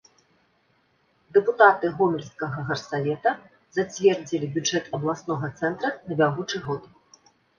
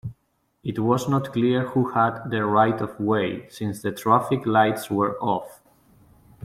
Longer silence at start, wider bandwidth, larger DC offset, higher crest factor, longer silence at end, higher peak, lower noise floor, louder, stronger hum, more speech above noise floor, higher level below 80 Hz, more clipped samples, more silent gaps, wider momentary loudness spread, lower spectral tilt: first, 1.35 s vs 0.05 s; second, 7.2 kHz vs 16 kHz; neither; about the same, 22 dB vs 18 dB; second, 0.75 s vs 0.9 s; about the same, -2 dBFS vs -4 dBFS; about the same, -66 dBFS vs -69 dBFS; about the same, -24 LUFS vs -23 LUFS; neither; second, 42 dB vs 47 dB; about the same, -64 dBFS vs -60 dBFS; neither; neither; first, 13 LU vs 10 LU; second, -5 dB/octave vs -6.5 dB/octave